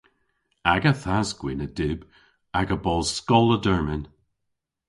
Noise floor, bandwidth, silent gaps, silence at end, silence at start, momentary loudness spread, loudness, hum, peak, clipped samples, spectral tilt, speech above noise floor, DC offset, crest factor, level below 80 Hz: -80 dBFS; 11.5 kHz; none; 0.85 s; 0.65 s; 11 LU; -24 LUFS; none; -2 dBFS; under 0.1%; -5.5 dB/octave; 57 dB; under 0.1%; 22 dB; -42 dBFS